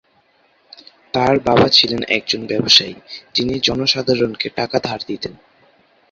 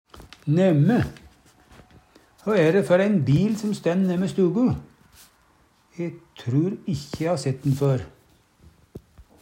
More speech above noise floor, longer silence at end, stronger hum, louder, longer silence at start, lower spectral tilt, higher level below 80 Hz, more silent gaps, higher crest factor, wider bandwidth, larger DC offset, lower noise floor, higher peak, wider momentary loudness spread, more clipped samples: about the same, 40 dB vs 39 dB; first, 0.8 s vs 0.45 s; neither; first, -16 LUFS vs -23 LUFS; first, 1.15 s vs 0.15 s; second, -4 dB/octave vs -7.5 dB/octave; first, -48 dBFS vs -54 dBFS; neither; about the same, 18 dB vs 18 dB; second, 7.8 kHz vs 15.5 kHz; neither; about the same, -58 dBFS vs -60 dBFS; first, 0 dBFS vs -6 dBFS; about the same, 14 LU vs 14 LU; neither